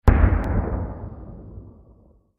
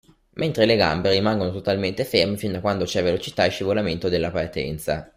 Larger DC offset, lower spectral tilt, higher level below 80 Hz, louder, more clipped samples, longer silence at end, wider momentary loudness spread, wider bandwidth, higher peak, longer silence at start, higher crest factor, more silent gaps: neither; first, -9.5 dB/octave vs -5.5 dB/octave; first, -24 dBFS vs -48 dBFS; about the same, -23 LUFS vs -22 LUFS; neither; first, 0.7 s vs 0.1 s; first, 22 LU vs 8 LU; second, 4.1 kHz vs 16 kHz; about the same, -2 dBFS vs -2 dBFS; second, 0.05 s vs 0.35 s; about the same, 22 dB vs 20 dB; neither